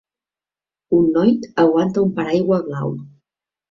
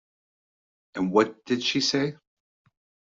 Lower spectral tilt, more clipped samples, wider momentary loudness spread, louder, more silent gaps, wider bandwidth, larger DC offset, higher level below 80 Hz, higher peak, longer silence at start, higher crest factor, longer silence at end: first, -8.5 dB/octave vs -4 dB/octave; neither; about the same, 10 LU vs 8 LU; first, -18 LUFS vs -25 LUFS; neither; about the same, 7.2 kHz vs 7.8 kHz; neither; first, -56 dBFS vs -68 dBFS; about the same, -4 dBFS vs -6 dBFS; about the same, 0.9 s vs 0.95 s; second, 16 dB vs 22 dB; second, 0.6 s vs 1 s